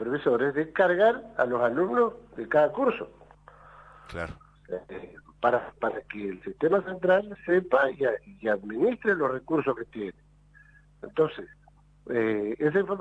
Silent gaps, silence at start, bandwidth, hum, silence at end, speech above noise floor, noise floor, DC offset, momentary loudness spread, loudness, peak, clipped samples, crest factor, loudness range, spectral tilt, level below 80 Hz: none; 0 s; 8.2 kHz; 50 Hz at -60 dBFS; 0 s; 30 dB; -56 dBFS; under 0.1%; 14 LU; -27 LUFS; -10 dBFS; under 0.1%; 18 dB; 6 LU; -8 dB/octave; -58 dBFS